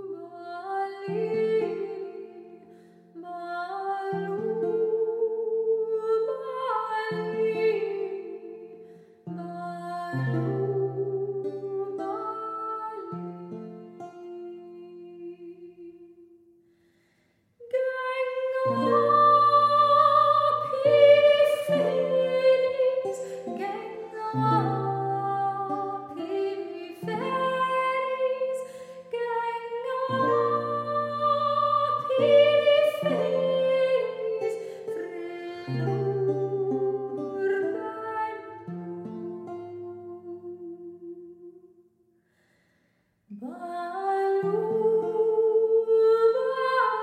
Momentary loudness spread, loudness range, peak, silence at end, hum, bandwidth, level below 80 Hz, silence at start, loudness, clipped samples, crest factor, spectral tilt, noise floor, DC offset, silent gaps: 20 LU; 18 LU; -8 dBFS; 0 s; none; 13.5 kHz; -80 dBFS; 0 s; -25 LUFS; under 0.1%; 20 dB; -6.5 dB/octave; -70 dBFS; under 0.1%; none